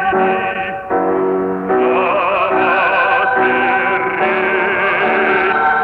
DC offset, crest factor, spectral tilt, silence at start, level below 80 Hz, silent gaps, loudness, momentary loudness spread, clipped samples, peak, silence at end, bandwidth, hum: under 0.1%; 12 dB; -7 dB/octave; 0 s; -50 dBFS; none; -14 LUFS; 5 LU; under 0.1%; -2 dBFS; 0 s; 5 kHz; none